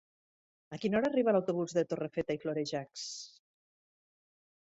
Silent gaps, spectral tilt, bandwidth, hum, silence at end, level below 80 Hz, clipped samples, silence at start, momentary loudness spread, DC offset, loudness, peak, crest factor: none; -5.5 dB/octave; 8.2 kHz; none; 1.5 s; -72 dBFS; under 0.1%; 0.7 s; 13 LU; under 0.1%; -33 LUFS; -16 dBFS; 18 dB